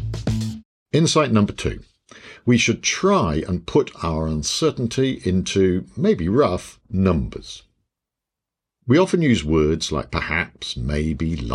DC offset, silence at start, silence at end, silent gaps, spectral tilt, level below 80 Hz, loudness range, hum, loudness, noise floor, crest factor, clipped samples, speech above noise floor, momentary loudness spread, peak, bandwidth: under 0.1%; 0 s; 0 s; 0.65-0.86 s; -5 dB/octave; -38 dBFS; 2 LU; none; -21 LUFS; -86 dBFS; 18 dB; under 0.1%; 66 dB; 11 LU; -4 dBFS; 13 kHz